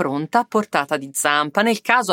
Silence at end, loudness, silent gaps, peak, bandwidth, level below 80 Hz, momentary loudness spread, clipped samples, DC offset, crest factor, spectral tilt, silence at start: 0 s; -19 LUFS; none; -2 dBFS; 16.5 kHz; -72 dBFS; 4 LU; under 0.1%; under 0.1%; 18 dB; -3 dB/octave; 0 s